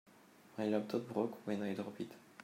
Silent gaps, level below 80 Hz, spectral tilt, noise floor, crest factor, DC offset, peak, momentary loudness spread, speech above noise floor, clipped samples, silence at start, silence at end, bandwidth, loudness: none; -88 dBFS; -7 dB/octave; -63 dBFS; 20 dB; under 0.1%; -22 dBFS; 11 LU; 24 dB; under 0.1%; 0.05 s; 0 s; 16 kHz; -40 LUFS